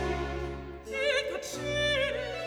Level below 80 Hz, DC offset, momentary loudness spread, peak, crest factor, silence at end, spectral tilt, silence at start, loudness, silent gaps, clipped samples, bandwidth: -44 dBFS; under 0.1%; 10 LU; -16 dBFS; 16 dB; 0 s; -3.5 dB/octave; 0 s; -31 LUFS; none; under 0.1%; over 20 kHz